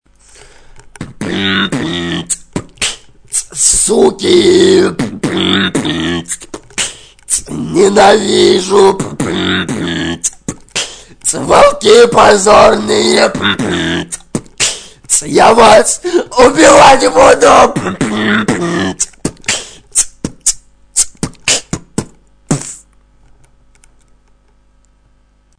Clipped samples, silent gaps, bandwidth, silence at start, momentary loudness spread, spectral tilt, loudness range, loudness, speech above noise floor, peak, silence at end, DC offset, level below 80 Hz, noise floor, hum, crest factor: 1%; none; 11 kHz; 0.75 s; 14 LU; -3 dB/octave; 10 LU; -10 LUFS; 42 dB; 0 dBFS; 2.85 s; under 0.1%; -38 dBFS; -50 dBFS; 50 Hz at -45 dBFS; 12 dB